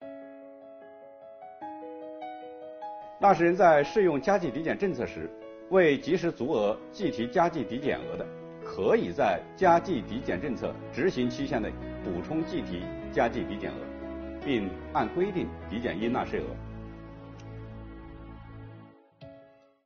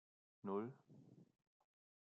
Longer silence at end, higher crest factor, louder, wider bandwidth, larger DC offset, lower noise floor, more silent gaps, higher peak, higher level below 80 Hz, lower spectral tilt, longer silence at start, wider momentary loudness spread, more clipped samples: second, 0.4 s vs 0.95 s; about the same, 22 dB vs 22 dB; first, -28 LUFS vs -49 LUFS; first, 6.8 kHz vs 3.9 kHz; neither; second, -57 dBFS vs -66 dBFS; neither; first, -8 dBFS vs -32 dBFS; first, -52 dBFS vs under -90 dBFS; second, -5 dB/octave vs -8.5 dB/octave; second, 0 s vs 0.45 s; about the same, 22 LU vs 20 LU; neither